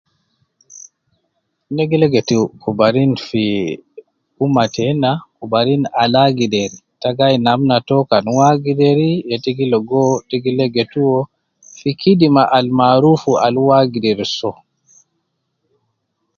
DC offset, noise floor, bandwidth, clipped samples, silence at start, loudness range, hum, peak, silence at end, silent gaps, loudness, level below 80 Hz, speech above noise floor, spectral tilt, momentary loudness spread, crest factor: under 0.1%; -70 dBFS; 7.2 kHz; under 0.1%; 0.75 s; 4 LU; none; 0 dBFS; 1.85 s; none; -15 LUFS; -54 dBFS; 56 dB; -6.5 dB/octave; 9 LU; 16 dB